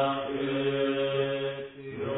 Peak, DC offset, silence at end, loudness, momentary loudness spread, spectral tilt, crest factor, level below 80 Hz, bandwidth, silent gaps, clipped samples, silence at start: -16 dBFS; under 0.1%; 0 s; -30 LUFS; 10 LU; -10 dB/octave; 14 dB; -62 dBFS; 4 kHz; none; under 0.1%; 0 s